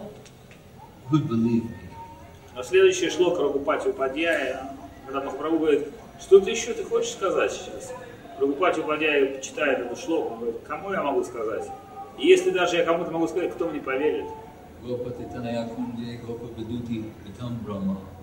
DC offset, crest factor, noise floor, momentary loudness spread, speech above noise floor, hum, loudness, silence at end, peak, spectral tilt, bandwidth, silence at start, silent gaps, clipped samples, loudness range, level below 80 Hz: under 0.1%; 22 dB; -48 dBFS; 20 LU; 23 dB; none; -25 LUFS; 0 s; -4 dBFS; -5 dB/octave; 16 kHz; 0 s; none; under 0.1%; 7 LU; -56 dBFS